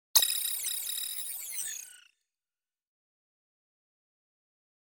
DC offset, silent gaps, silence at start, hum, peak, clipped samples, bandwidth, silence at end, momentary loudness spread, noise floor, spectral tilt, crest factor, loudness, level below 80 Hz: under 0.1%; none; 0.15 s; none; -6 dBFS; under 0.1%; 17 kHz; 2.95 s; 14 LU; under -90 dBFS; 4.5 dB/octave; 30 dB; -30 LUFS; -84 dBFS